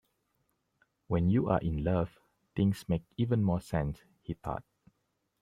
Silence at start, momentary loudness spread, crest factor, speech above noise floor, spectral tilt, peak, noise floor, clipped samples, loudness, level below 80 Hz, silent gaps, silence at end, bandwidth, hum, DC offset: 1.1 s; 13 LU; 20 dB; 49 dB; -8.5 dB/octave; -12 dBFS; -80 dBFS; under 0.1%; -32 LUFS; -50 dBFS; none; 0.8 s; 14.5 kHz; none; under 0.1%